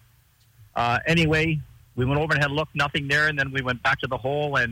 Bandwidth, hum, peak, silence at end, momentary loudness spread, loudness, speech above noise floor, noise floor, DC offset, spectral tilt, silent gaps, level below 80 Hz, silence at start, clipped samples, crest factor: 16.5 kHz; none; -10 dBFS; 0 s; 6 LU; -23 LUFS; 36 dB; -59 dBFS; under 0.1%; -5.5 dB/octave; none; -46 dBFS; 0.75 s; under 0.1%; 14 dB